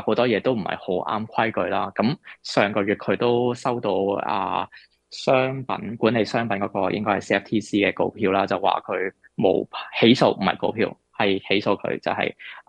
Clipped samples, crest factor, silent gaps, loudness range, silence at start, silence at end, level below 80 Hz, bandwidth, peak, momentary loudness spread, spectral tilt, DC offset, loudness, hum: under 0.1%; 20 dB; none; 2 LU; 0 s; 0.1 s; -64 dBFS; 10 kHz; -4 dBFS; 7 LU; -6 dB/octave; under 0.1%; -23 LUFS; none